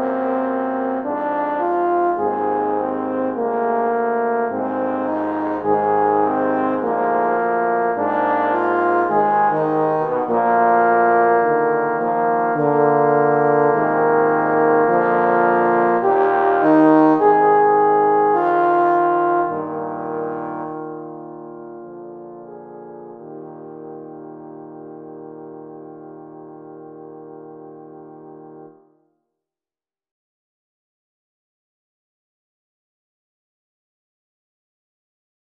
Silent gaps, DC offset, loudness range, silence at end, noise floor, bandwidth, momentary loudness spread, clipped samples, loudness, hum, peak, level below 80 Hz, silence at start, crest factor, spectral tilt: none; under 0.1%; 21 LU; 6.85 s; under -90 dBFS; 4.6 kHz; 22 LU; under 0.1%; -17 LUFS; none; -2 dBFS; -68 dBFS; 0 s; 18 dB; -9.5 dB/octave